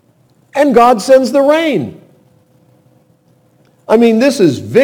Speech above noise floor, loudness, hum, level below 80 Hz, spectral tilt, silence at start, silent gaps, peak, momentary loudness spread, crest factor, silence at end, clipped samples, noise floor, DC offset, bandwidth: 42 dB; -10 LUFS; none; -54 dBFS; -5.5 dB/octave; 0.55 s; none; 0 dBFS; 9 LU; 12 dB; 0 s; 0.5%; -51 dBFS; under 0.1%; 18.5 kHz